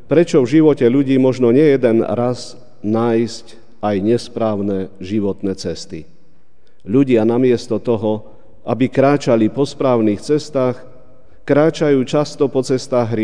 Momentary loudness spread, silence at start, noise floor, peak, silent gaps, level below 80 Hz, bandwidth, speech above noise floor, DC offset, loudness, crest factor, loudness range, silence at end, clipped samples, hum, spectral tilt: 13 LU; 0.1 s; -57 dBFS; 0 dBFS; none; -54 dBFS; 10 kHz; 42 dB; 2%; -16 LUFS; 16 dB; 6 LU; 0 s; under 0.1%; none; -7 dB/octave